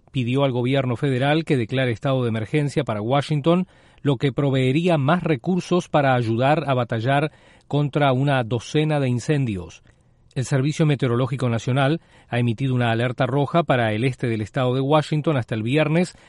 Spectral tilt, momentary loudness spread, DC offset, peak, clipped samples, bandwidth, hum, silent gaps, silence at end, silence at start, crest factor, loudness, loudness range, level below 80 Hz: -7 dB/octave; 5 LU; under 0.1%; -6 dBFS; under 0.1%; 11.5 kHz; none; none; 0.2 s; 0.15 s; 16 dB; -21 LUFS; 2 LU; -54 dBFS